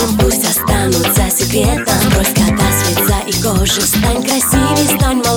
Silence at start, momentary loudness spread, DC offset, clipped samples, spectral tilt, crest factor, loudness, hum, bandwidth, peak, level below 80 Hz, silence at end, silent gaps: 0 s; 2 LU; under 0.1%; under 0.1%; -4 dB/octave; 12 dB; -12 LUFS; none; over 20 kHz; 0 dBFS; -22 dBFS; 0 s; none